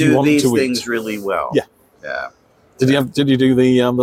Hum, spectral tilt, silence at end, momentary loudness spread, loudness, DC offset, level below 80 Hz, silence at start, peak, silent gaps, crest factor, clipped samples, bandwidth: none; -5.5 dB/octave; 0 s; 14 LU; -16 LUFS; under 0.1%; -52 dBFS; 0 s; -2 dBFS; none; 14 dB; under 0.1%; 16 kHz